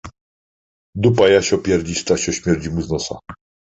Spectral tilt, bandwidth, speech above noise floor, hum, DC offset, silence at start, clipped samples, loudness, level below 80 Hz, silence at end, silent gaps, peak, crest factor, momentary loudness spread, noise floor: -5 dB/octave; 8.2 kHz; over 73 dB; none; under 0.1%; 0.05 s; under 0.1%; -18 LUFS; -40 dBFS; 0.45 s; 0.21-0.93 s; -2 dBFS; 16 dB; 13 LU; under -90 dBFS